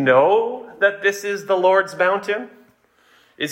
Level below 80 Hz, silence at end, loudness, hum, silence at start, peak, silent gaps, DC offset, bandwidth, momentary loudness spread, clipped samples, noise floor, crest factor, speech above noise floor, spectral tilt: -72 dBFS; 0 s; -19 LUFS; none; 0 s; -4 dBFS; none; under 0.1%; 16.5 kHz; 12 LU; under 0.1%; -57 dBFS; 16 dB; 39 dB; -4.5 dB/octave